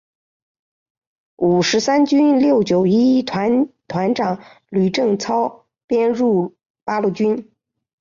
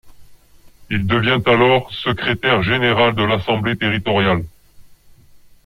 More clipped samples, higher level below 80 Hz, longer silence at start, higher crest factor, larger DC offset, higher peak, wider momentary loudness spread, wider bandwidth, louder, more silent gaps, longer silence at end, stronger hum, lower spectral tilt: neither; second, -60 dBFS vs -44 dBFS; first, 1.4 s vs 0.05 s; about the same, 12 dB vs 16 dB; neither; second, -6 dBFS vs -2 dBFS; about the same, 10 LU vs 9 LU; second, 7.4 kHz vs 15.5 kHz; about the same, -17 LUFS vs -17 LUFS; first, 5.84-5.88 s, 6.70-6.74 s vs none; first, 0.6 s vs 0.3 s; neither; about the same, -6 dB/octave vs -7 dB/octave